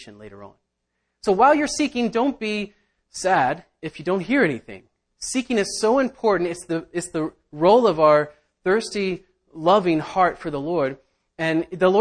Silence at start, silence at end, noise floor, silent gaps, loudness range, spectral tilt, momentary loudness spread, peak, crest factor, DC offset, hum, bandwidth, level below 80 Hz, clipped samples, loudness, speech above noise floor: 0 s; 0 s; -76 dBFS; none; 4 LU; -4.5 dB/octave; 15 LU; -4 dBFS; 18 dB; under 0.1%; none; 10.5 kHz; -56 dBFS; under 0.1%; -21 LUFS; 55 dB